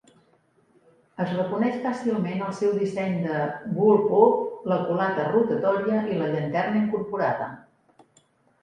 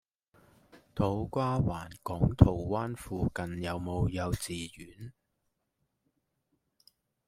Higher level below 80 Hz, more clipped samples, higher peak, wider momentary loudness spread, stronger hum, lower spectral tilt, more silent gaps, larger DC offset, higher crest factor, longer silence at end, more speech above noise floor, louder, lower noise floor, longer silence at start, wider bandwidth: second, -68 dBFS vs -44 dBFS; neither; about the same, -4 dBFS vs -4 dBFS; second, 9 LU vs 19 LU; neither; about the same, -8 dB/octave vs -7 dB/octave; neither; neither; second, 22 dB vs 30 dB; second, 1.05 s vs 2.2 s; second, 40 dB vs 50 dB; first, -24 LUFS vs -32 LUFS; second, -63 dBFS vs -81 dBFS; first, 1.2 s vs 0.75 s; second, 9.4 kHz vs 16 kHz